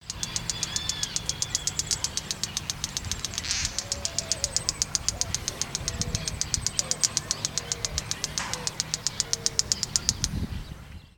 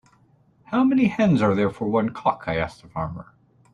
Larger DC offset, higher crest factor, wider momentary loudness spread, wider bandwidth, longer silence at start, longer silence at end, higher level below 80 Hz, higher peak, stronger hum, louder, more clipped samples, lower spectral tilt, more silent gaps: neither; first, 30 dB vs 16 dB; second, 6 LU vs 12 LU; first, 19 kHz vs 9.4 kHz; second, 0 s vs 0.7 s; second, 0.05 s vs 0.5 s; first, -44 dBFS vs -52 dBFS; first, 0 dBFS vs -6 dBFS; neither; second, -28 LUFS vs -22 LUFS; neither; second, -1 dB/octave vs -8 dB/octave; neither